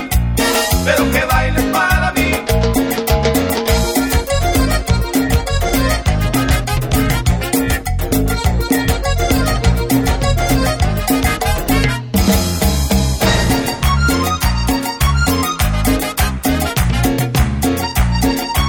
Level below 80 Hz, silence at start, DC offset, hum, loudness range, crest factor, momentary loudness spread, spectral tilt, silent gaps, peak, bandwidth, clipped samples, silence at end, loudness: -20 dBFS; 0 s; under 0.1%; none; 1 LU; 14 dB; 3 LU; -4.5 dB/octave; none; -2 dBFS; 16 kHz; under 0.1%; 0 s; -15 LUFS